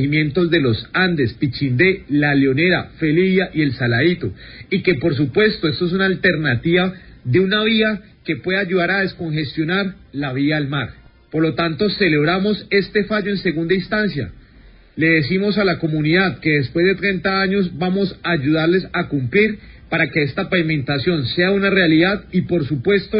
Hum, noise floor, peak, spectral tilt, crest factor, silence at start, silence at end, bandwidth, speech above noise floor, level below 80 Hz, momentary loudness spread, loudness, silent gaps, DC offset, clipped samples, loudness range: none; -46 dBFS; -2 dBFS; -11.5 dB/octave; 16 dB; 0 s; 0 s; 5.4 kHz; 28 dB; -44 dBFS; 7 LU; -18 LUFS; none; under 0.1%; under 0.1%; 2 LU